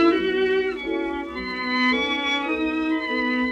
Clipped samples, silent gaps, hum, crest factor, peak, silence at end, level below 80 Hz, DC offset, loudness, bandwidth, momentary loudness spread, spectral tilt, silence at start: under 0.1%; none; none; 16 dB; -8 dBFS; 0 s; -50 dBFS; under 0.1%; -23 LUFS; 8.4 kHz; 7 LU; -4.5 dB/octave; 0 s